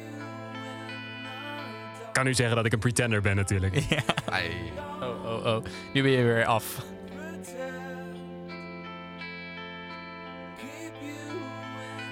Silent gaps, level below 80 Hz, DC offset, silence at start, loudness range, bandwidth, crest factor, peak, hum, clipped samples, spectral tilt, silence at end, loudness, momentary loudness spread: none; -54 dBFS; under 0.1%; 0 s; 12 LU; 16.5 kHz; 24 dB; -6 dBFS; none; under 0.1%; -5 dB/octave; 0 s; -30 LUFS; 16 LU